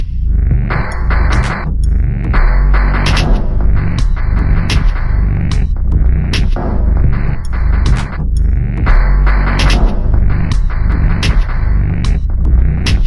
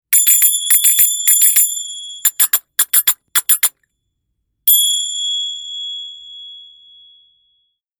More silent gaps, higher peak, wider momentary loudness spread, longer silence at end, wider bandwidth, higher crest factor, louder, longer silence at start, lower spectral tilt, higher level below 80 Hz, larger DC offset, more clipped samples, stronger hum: neither; about the same, 0 dBFS vs 0 dBFS; second, 4 LU vs 17 LU; second, 0 s vs 1.35 s; second, 11.5 kHz vs over 20 kHz; second, 10 dB vs 16 dB; second, -15 LUFS vs -11 LUFS; about the same, 0 s vs 0.1 s; first, -6.5 dB/octave vs 5 dB/octave; first, -12 dBFS vs -66 dBFS; neither; neither; neither